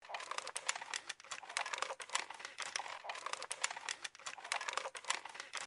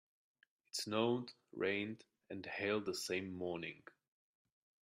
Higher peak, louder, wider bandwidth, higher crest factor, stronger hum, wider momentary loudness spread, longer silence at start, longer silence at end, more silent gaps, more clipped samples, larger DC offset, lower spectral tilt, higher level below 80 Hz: first, -16 dBFS vs -24 dBFS; about the same, -42 LUFS vs -41 LUFS; second, 11.5 kHz vs 13.5 kHz; first, 28 dB vs 20 dB; neither; second, 6 LU vs 14 LU; second, 0 s vs 0.75 s; second, 0 s vs 1.05 s; neither; neither; neither; second, 2 dB/octave vs -4 dB/octave; second, -90 dBFS vs -84 dBFS